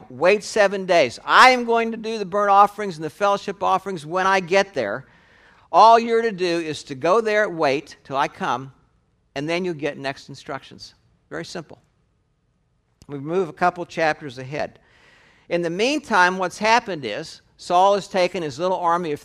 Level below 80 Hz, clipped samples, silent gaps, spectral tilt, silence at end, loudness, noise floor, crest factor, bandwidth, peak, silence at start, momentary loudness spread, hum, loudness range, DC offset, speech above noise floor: -62 dBFS; under 0.1%; none; -4 dB/octave; 0.05 s; -20 LUFS; -66 dBFS; 22 dB; 15 kHz; 0 dBFS; 0 s; 17 LU; none; 12 LU; under 0.1%; 46 dB